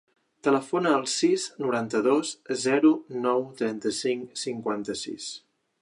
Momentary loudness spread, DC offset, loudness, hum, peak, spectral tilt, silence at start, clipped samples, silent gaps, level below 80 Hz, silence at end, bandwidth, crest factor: 11 LU; under 0.1%; -26 LUFS; none; -8 dBFS; -4 dB/octave; 0.45 s; under 0.1%; none; -74 dBFS; 0.45 s; 11 kHz; 18 dB